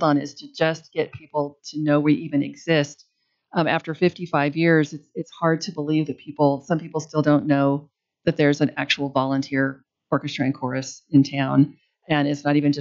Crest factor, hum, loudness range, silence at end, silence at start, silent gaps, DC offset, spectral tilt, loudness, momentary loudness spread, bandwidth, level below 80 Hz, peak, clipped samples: 16 dB; none; 2 LU; 0 s; 0 s; none; under 0.1%; -6.5 dB/octave; -22 LUFS; 9 LU; 7.4 kHz; -66 dBFS; -6 dBFS; under 0.1%